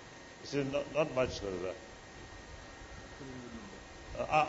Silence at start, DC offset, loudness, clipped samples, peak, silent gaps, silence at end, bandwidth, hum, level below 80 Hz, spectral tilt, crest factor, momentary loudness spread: 0 s; under 0.1%; -37 LUFS; under 0.1%; -16 dBFS; none; 0 s; 7.6 kHz; none; -56 dBFS; -4 dB/octave; 22 dB; 17 LU